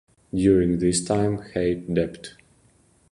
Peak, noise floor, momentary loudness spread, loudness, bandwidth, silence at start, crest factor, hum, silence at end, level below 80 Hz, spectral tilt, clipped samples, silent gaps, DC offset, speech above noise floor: -6 dBFS; -60 dBFS; 12 LU; -23 LUFS; 11.5 kHz; 0.35 s; 18 dB; none; 0.8 s; -44 dBFS; -6 dB/octave; under 0.1%; none; under 0.1%; 37 dB